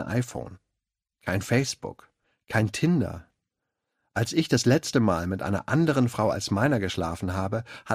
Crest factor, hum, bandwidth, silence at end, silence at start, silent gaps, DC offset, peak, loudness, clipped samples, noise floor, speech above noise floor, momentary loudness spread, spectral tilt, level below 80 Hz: 20 dB; none; 15.5 kHz; 0 s; 0 s; none; under 0.1%; -6 dBFS; -26 LUFS; under 0.1%; -86 dBFS; 60 dB; 12 LU; -5.5 dB/octave; -54 dBFS